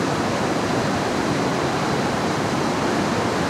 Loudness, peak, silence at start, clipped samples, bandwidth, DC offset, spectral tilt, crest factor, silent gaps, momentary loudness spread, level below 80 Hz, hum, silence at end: -22 LUFS; -8 dBFS; 0 s; under 0.1%; 16 kHz; under 0.1%; -5 dB/octave; 14 dB; none; 1 LU; -48 dBFS; none; 0 s